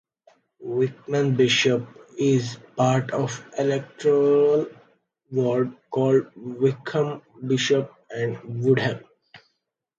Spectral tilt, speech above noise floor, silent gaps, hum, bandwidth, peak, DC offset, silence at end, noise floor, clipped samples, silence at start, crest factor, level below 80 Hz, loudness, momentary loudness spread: -5.5 dB/octave; 55 dB; none; none; 7.8 kHz; -8 dBFS; under 0.1%; 0.6 s; -77 dBFS; under 0.1%; 0.6 s; 16 dB; -66 dBFS; -23 LUFS; 11 LU